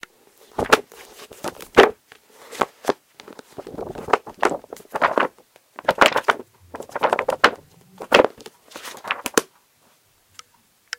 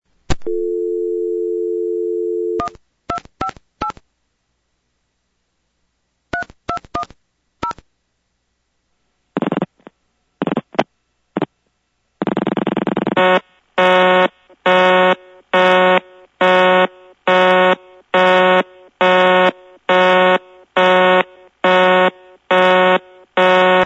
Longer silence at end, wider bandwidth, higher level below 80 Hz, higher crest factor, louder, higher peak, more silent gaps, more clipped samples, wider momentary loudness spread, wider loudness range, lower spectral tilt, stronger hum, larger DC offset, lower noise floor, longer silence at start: first, 1.55 s vs 0 s; first, 17 kHz vs 8 kHz; second, -54 dBFS vs -46 dBFS; first, 24 dB vs 16 dB; second, -20 LUFS vs -15 LUFS; about the same, 0 dBFS vs 0 dBFS; neither; neither; first, 23 LU vs 15 LU; second, 5 LU vs 16 LU; second, -2.5 dB/octave vs -5.5 dB/octave; second, none vs 60 Hz at -50 dBFS; neither; second, -60 dBFS vs -69 dBFS; first, 0.6 s vs 0.3 s